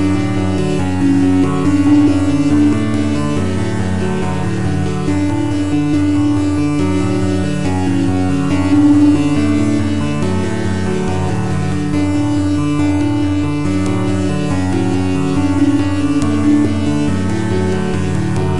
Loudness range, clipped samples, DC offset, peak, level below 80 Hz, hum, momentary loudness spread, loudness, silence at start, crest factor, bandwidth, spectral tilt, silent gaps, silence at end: 3 LU; under 0.1%; 7%; -2 dBFS; -40 dBFS; none; 6 LU; -15 LUFS; 0 s; 12 dB; 11.5 kHz; -7 dB/octave; none; 0 s